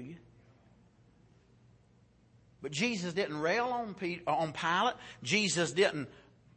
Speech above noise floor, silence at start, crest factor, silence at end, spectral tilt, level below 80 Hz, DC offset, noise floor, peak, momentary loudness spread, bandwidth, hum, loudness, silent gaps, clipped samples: 32 dB; 0 s; 20 dB; 0.35 s; -3.5 dB/octave; -70 dBFS; under 0.1%; -65 dBFS; -16 dBFS; 14 LU; 8.8 kHz; none; -32 LUFS; none; under 0.1%